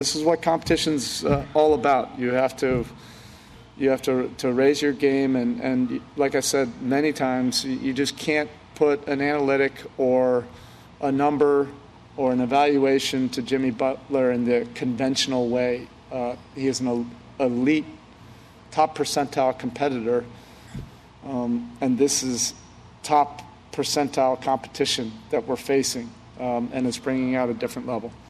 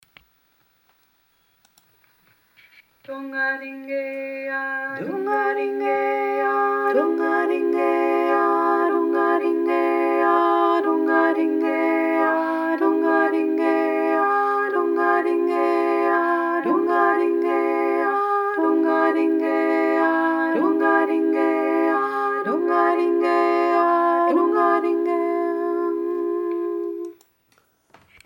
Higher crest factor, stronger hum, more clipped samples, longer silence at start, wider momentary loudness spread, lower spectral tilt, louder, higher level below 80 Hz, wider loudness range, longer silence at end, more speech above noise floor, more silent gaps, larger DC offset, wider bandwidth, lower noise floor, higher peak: about the same, 16 dB vs 16 dB; neither; neither; second, 0 s vs 3.1 s; first, 10 LU vs 7 LU; second, -4 dB/octave vs -6 dB/octave; second, -23 LUFS vs -20 LUFS; first, -52 dBFS vs -78 dBFS; second, 4 LU vs 7 LU; second, 0.1 s vs 1.15 s; second, 24 dB vs 41 dB; neither; neither; second, 13.5 kHz vs 16.5 kHz; second, -47 dBFS vs -64 dBFS; second, -8 dBFS vs -4 dBFS